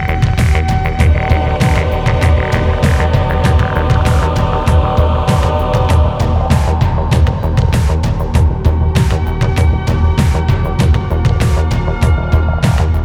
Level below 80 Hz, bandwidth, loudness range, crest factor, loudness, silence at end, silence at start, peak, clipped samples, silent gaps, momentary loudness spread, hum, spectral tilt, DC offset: -16 dBFS; 13 kHz; 1 LU; 12 dB; -13 LUFS; 0 s; 0 s; 0 dBFS; under 0.1%; none; 2 LU; none; -7 dB/octave; under 0.1%